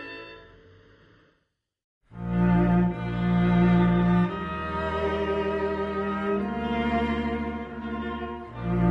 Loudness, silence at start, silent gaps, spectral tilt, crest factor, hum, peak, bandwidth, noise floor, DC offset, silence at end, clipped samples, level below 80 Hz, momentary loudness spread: -26 LUFS; 0 s; 1.84-2.01 s; -9.5 dB/octave; 16 dB; none; -10 dBFS; 5.4 kHz; -75 dBFS; under 0.1%; 0 s; under 0.1%; -40 dBFS; 13 LU